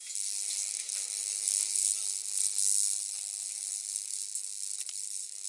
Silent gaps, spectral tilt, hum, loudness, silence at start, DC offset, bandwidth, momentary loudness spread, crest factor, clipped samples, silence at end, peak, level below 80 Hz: none; 7 dB/octave; none; -30 LUFS; 0 s; under 0.1%; 11.5 kHz; 9 LU; 26 dB; under 0.1%; 0 s; -8 dBFS; under -90 dBFS